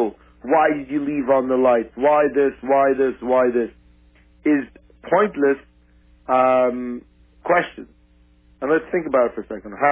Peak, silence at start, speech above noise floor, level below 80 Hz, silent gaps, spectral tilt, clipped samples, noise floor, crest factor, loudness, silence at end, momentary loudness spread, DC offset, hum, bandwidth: -4 dBFS; 0 s; 36 dB; -54 dBFS; none; -9.5 dB/octave; under 0.1%; -54 dBFS; 16 dB; -19 LUFS; 0 s; 14 LU; under 0.1%; none; 3.7 kHz